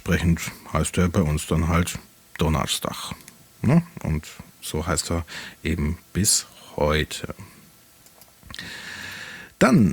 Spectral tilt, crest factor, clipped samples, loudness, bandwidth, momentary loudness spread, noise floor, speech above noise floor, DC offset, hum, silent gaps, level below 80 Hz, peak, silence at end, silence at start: -4.5 dB/octave; 20 dB; under 0.1%; -24 LUFS; over 20 kHz; 16 LU; -52 dBFS; 30 dB; under 0.1%; none; none; -40 dBFS; -4 dBFS; 0 s; 0.05 s